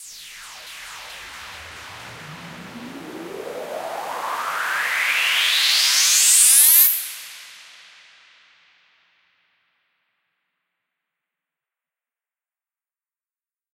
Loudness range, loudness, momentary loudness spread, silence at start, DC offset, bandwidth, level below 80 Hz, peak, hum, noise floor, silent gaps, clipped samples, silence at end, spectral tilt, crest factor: 21 LU; -14 LUFS; 26 LU; 0 s; under 0.1%; 16 kHz; -66 dBFS; 0 dBFS; none; under -90 dBFS; none; under 0.1%; 6.2 s; 2 dB/octave; 24 dB